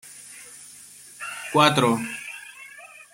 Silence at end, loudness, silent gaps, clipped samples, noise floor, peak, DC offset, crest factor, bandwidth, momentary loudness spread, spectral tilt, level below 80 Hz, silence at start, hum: 0.1 s; -22 LUFS; none; under 0.1%; -46 dBFS; -2 dBFS; under 0.1%; 24 dB; 16.5 kHz; 24 LU; -4 dB/octave; -66 dBFS; 0.05 s; none